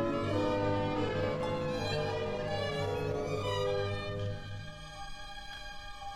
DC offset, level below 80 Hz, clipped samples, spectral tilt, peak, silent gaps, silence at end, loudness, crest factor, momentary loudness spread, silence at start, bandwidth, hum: under 0.1%; -50 dBFS; under 0.1%; -6 dB/octave; -20 dBFS; none; 0 s; -35 LUFS; 14 dB; 13 LU; 0 s; 13.5 kHz; none